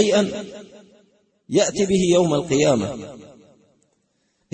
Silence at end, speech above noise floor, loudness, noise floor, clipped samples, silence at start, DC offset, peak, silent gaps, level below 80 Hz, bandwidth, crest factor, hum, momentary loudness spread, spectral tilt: 1.3 s; 49 dB; -19 LUFS; -68 dBFS; under 0.1%; 0 s; under 0.1%; -4 dBFS; none; -54 dBFS; 8.8 kHz; 18 dB; none; 19 LU; -5 dB/octave